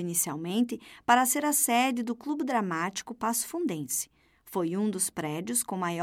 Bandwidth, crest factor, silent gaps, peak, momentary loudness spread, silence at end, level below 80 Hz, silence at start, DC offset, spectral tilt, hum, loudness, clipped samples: 17 kHz; 22 dB; none; -8 dBFS; 9 LU; 0 s; -72 dBFS; 0 s; under 0.1%; -3 dB/octave; none; -28 LUFS; under 0.1%